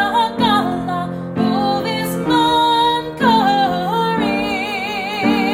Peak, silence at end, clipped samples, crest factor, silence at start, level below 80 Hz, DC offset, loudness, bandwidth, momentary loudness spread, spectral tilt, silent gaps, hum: -2 dBFS; 0 s; under 0.1%; 16 dB; 0 s; -46 dBFS; under 0.1%; -17 LUFS; 16 kHz; 7 LU; -5 dB/octave; none; none